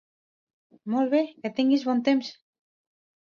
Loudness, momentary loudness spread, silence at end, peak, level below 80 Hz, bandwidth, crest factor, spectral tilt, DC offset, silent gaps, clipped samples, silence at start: -25 LUFS; 10 LU; 1 s; -10 dBFS; -78 dBFS; 7 kHz; 16 dB; -5.5 dB/octave; under 0.1%; none; under 0.1%; 0.85 s